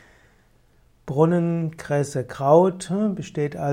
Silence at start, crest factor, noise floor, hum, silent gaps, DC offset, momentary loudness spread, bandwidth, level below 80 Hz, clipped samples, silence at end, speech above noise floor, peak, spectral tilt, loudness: 1.05 s; 18 dB; -58 dBFS; none; none; under 0.1%; 11 LU; 12 kHz; -58 dBFS; under 0.1%; 0 s; 37 dB; -4 dBFS; -7.5 dB/octave; -22 LUFS